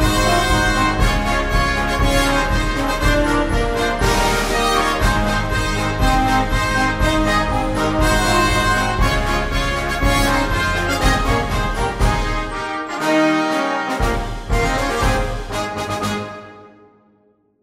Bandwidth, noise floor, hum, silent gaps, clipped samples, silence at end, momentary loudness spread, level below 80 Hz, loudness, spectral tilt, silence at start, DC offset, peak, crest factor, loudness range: 16 kHz; -58 dBFS; none; none; under 0.1%; 0.95 s; 7 LU; -24 dBFS; -18 LUFS; -4.5 dB/octave; 0 s; under 0.1%; -2 dBFS; 16 dB; 3 LU